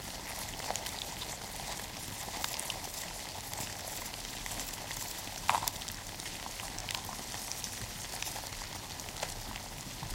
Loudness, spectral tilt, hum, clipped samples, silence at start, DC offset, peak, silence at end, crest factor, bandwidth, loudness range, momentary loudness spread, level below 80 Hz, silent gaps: -38 LUFS; -1.5 dB/octave; none; under 0.1%; 0 s; under 0.1%; -8 dBFS; 0 s; 32 dB; 17 kHz; 2 LU; 5 LU; -54 dBFS; none